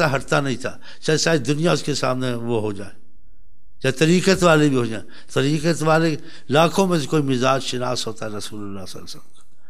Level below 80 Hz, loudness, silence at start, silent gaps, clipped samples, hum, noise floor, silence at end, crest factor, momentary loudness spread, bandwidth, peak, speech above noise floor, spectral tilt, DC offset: -52 dBFS; -20 LUFS; 0 s; none; under 0.1%; none; -52 dBFS; 0.5 s; 18 dB; 17 LU; 15 kHz; -2 dBFS; 32 dB; -5 dB/octave; 3%